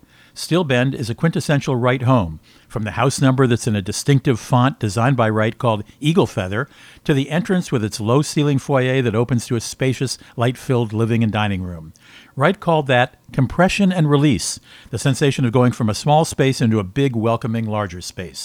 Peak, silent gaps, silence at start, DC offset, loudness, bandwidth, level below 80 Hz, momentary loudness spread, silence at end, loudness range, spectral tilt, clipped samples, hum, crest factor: 0 dBFS; none; 0.35 s; under 0.1%; -18 LUFS; 16 kHz; -46 dBFS; 10 LU; 0 s; 2 LU; -6 dB/octave; under 0.1%; none; 18 dB